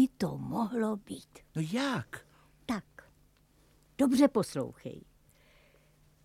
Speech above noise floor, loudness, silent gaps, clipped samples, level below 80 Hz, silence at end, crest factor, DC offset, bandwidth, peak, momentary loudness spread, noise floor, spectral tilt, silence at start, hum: 34 dB; -32 LUFS; none; under 0.1%; -64 dBFS; 1.25 s; 22 dB; under 0.1%; 15.5 kHz; -12 dBFS; 21 LU; -65 dBFS; -6 dB/octave; 0 s; none